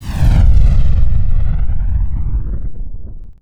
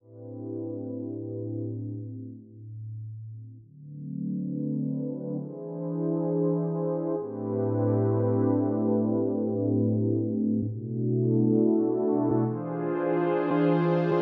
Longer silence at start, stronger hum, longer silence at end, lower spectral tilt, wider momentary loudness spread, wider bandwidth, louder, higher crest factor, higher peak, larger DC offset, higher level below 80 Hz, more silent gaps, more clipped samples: about the same, 0 s vs 0.1 s; neither; about the same, 0.1 s vs 0 s; second, -8 dB/octave vs -10 dB/octave; first, 19 LU vs 16 LU; about the same, 5 kHz vs 4.8 kHz; first, -17 LUFS vs -28 LUFS; second, 10 dB vs 16 dB; first, 0 dBFS vs -12 dBFS; neither; first, -12 dBFS vs -72 dBFS; neither; neither